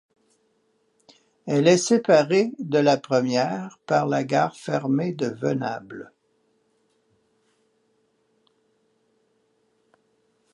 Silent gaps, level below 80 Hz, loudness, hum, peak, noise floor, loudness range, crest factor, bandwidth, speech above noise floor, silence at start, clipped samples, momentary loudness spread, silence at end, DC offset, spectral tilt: none; -74 dBFS; -22 LUFS; none; -4 dBFS; -68 dBFS; 12 LU; 20 dB; 11.5 kHz; 46 dB; 1.45 s; under 0.1%; 13 LU; 4.5 s; under 0.1%; -5.5 dB/octave